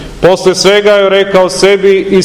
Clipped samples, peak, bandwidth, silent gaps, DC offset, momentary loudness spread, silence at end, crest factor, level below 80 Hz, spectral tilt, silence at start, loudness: 6%; 0 dBFS; 14 kHz; none; under 0.1%; 2 LU; 0 s; 8 dB; -36 dBFS; -4 dB/octave; 0 s; -7 LUFS